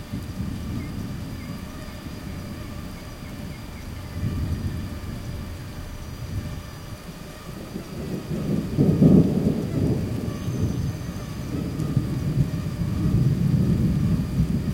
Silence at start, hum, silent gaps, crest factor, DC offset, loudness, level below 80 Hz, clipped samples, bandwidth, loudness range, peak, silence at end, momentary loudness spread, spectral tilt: 0 s; none; none; 22 dB; under 0.1%; -26 LUFS; -38 dBFS; under 0.1%; 16.5 kHz; 12 LU; -4 dBFS; 0 s; 15 LU; -8 dB/octave